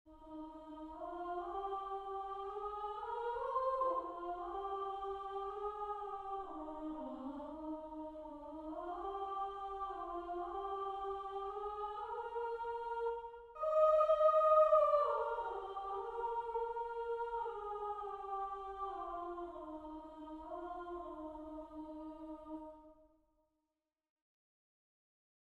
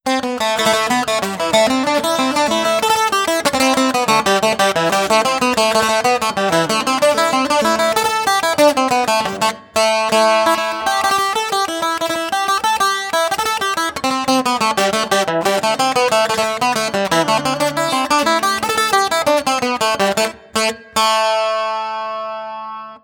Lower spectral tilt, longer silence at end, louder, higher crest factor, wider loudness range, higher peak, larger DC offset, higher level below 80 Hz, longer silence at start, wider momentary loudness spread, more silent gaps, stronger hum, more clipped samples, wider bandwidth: first, -6.5 dB/octave vs -2.5 dB/octave; first, 2.55 s vs 0.05 s; second, -40 LUFS vs -16 LUFS; about the same, 20 dB vs 16 dB; first, 16 LU vs 2 LU; second, -20 dBFS vs 0 dBFS; neither; second, -66 dBFS vs -54 dBFS; about the same, 0.05 s vs 0.05 s; first, 18 LU vs 5 LU; neither; neither; neither; second, 8 kHz vs 18 kHz